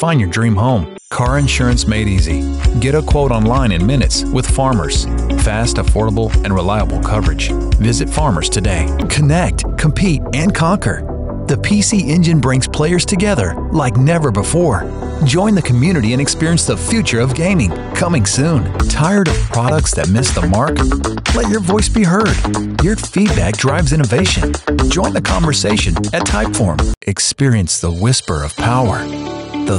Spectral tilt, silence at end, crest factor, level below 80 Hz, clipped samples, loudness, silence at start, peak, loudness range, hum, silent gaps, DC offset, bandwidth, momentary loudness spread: -5 dB/octave; 0 s; 10 dB; -20 dBFS; under 0.1%; -14 LUFS; 0 s; -4 dBFS; 1 LU; none; 26.97-27.01 s; under 0.1%; 11.5 kHz; 4 LU